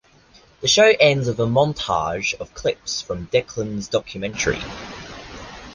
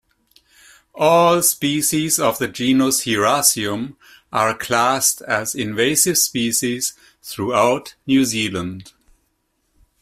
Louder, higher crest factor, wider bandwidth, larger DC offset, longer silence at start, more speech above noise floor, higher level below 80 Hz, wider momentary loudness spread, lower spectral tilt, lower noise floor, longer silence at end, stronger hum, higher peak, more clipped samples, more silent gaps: second, -20 LUFS vs -17 LUFS; about the same, 20 dB vs 18 dB; second, 10 kHz vs 16 kHz; neither; second, 0.6 s vs 0.95 s; second, 32 dB vs 50 dB; first, -46 dBFS vs -56 dBFS; first, 21 LU vs 12 LU; about the same, -3.5 dB/octave vs -3 dB/octave; second, -52 dBFS vs -68 dBFS; second, 0 s vs 1.15 s; neither; about the same, -2 dBFS vs 0 dBFS; neither; neither